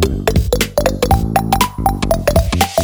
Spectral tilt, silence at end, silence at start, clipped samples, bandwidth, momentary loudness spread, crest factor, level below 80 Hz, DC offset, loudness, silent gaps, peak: -5 dB/octave; 0 s; 0 s; under 0.1%; over 20 kHz; 2 LU; 14 dB; -22 dBFS; under 0.1%; -15 LUFS; none; 0 dBFS